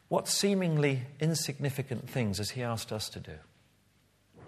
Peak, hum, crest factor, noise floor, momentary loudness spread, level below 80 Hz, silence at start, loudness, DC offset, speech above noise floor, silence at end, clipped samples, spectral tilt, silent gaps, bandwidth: -12 dBFS; none; 20 dB; -68 dBFS; 11 LU; -66 dBFS; 0.1 s; -31 LUFS; under 0.1%; 36 dB; 0 s; under 0.1%; -4.5 dB/octave; none; 14 kHz